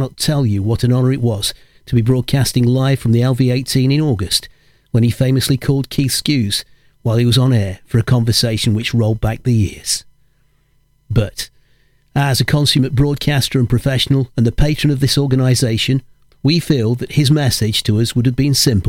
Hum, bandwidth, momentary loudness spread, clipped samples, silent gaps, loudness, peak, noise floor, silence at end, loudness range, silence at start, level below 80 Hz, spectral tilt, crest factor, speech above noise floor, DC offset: none; 16.5 kHz; 6 LU; under 0.1%; none; -15 LUFS; -2 dBFS; -56 dBFS; 0 s; 4 LU; 0 s; -34 dBFS; -5.5 dB/octave; 12 dB; 42 dB; under 0.1%